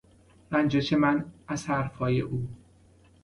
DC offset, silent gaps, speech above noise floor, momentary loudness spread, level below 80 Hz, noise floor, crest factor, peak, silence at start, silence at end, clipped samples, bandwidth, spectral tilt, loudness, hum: under 0.1%; none; 31 dB; 11 LU; -54 dBFS; -58 dBFS; 18 dB; -12 dBFS; 0.5 s; 0.7 s; under 0.1%; 11.5 kHz; -6.5 dB/octave; -28 LUFS; none